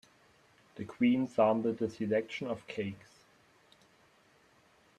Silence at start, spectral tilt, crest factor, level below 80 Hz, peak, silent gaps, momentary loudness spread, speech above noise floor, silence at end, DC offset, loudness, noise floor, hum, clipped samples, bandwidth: 0.75 s; -7 dB/octave; 20 dB; -74 dBFS; -14 dBFS; none; 18 LU; 34 dB; 2.05 s; under 0.1%; -32 LUFS; -66 dBFS; none; under 0.1%; 9.4 kHz